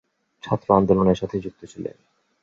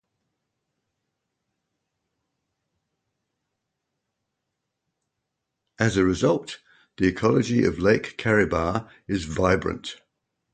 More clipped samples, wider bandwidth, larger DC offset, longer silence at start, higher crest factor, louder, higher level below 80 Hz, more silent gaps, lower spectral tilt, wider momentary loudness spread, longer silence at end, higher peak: neither; second, 7.4 kHz vs 9.2 kHz; neither; second, 0.45 s vs 5.8 s; about the same, 22 dB vs 22 dB; about the same, -21 LUFS vs -23 LUFS; about the same, -48 dBFS vs -46 dBFS; neither; first, -8.5 dB/octave vs -6 dB/octave; first, 18 LU vs 10 LU; about the same, 0.55 s vs 0.6 s; first, -2 dBFS vs -6 dBFS